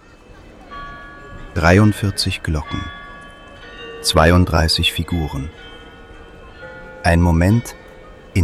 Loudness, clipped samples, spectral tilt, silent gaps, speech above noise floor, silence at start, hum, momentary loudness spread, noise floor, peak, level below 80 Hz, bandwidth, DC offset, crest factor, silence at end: -17 LUFS; under 0.1%; -5.5 dB/octave; none; 27 dB; 0.4 s; none; 25 LU; -42 dBFS; -2 dBFS; -34 dBFS; 14.5 kHz; under 0.1%; 18 dB; 0 s